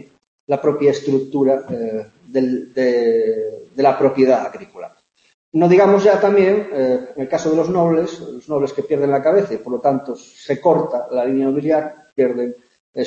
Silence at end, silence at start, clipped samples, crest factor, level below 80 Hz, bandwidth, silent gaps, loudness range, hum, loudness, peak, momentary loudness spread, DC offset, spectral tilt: 0 s; 0.5 s; under 0.1%; 16 dB; -62 dBFS; 7.6 kHz; 5.34-5.52 s, 12.80-12.93 s; 3 LU; none; -17 LUFS; -2 dBFS; 13 LU; under 0.1%; -7 dB/octave